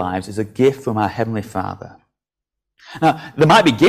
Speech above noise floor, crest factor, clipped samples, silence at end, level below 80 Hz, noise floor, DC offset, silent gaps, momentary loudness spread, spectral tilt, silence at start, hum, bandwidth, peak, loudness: 68 dB; 16 dB; under 0.1%; 0 s; -48 dBFS; -84 dBFS; under 0.1%; none; 15 LU; -6 dB/octave; 0 s; none; 15.5 kHz; -2 dBFS; -18 LUFS